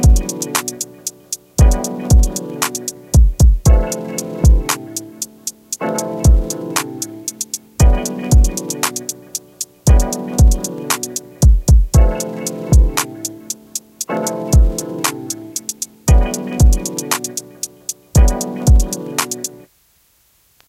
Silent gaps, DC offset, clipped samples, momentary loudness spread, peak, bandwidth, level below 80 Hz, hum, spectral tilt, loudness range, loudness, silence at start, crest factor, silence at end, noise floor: none; under 0.1%; under 0.1%; 11 LU; 0 dBFS; 15.5 kHz; -16 dBFS; none; -5 dB/octave; 3 LU; -17 LUFS; 0 s; 14 dB; 1.15 s; -56 dBFS